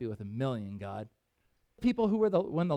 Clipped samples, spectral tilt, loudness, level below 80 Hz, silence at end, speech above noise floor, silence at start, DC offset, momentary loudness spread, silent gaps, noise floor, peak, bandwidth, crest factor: under 0.1%; -9 dB/octave; -32 LUFS; -60 dBFS; 0 s; 44 dB; 0 s; under 0.1%; 14 LU; none; -75 dBFS; -16 dBFS; 9.2 kHz; 16 dB